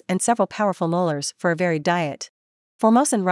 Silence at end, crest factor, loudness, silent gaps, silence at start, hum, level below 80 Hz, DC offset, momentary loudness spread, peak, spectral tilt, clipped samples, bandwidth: 0 s; 16 dB; -21 LUFS; 2.29-2.79 s; 0.1 s; none; -74 dBFS; under 0.1%; 8 LU; -6 dBFS; -5 dB/octave; under 0.1%; 12 kHz